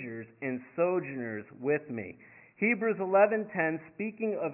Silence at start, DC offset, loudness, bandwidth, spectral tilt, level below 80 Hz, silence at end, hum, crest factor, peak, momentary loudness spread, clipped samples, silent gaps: 0 s; under 0.1%; -31 LUFS; 3 kHz; -8 dB/octave; -76 dBFS; 0 s; none; 20 dB; -12 dBFS; 14 LU; under 0.1%; none